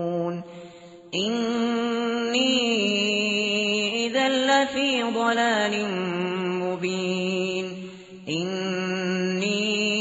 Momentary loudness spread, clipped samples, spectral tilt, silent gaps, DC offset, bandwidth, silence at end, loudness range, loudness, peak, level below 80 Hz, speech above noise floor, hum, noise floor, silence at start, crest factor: 10 LU; under 0.1%; -2.5 dB/octave; none; under 0.1%; 8 kHz; 0 s; 5 LU; -24 LUFS; -8 dBFS; -68 dBFS; 21 dB; none; -45 dBFS; 0 s; 16 dB